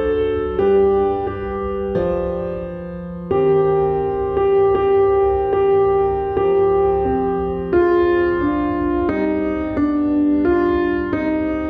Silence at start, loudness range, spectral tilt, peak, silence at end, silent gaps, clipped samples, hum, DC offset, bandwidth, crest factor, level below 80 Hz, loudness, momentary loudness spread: 0 s; 3 LU; -10 dB/octave; -6 dBFS; 0 s; none; under 0.1%; none; under 0.1%; 4.6 kHz; 12 dB; -36 dBFS; -18 LUFS; 8 LU